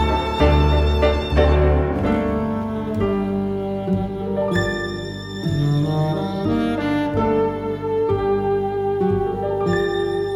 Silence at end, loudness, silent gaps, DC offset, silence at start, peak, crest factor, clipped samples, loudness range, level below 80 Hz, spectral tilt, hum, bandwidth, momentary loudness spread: 0 s; -20 LUFS; none; under 0.1%; 0 s; -4 dBFS; 16 dB; under 0.1%; 4 LU; -26 dBFS; -7.5 dB/octave; 50 Hz at -40 dBFS; 11 kHz; 7 LU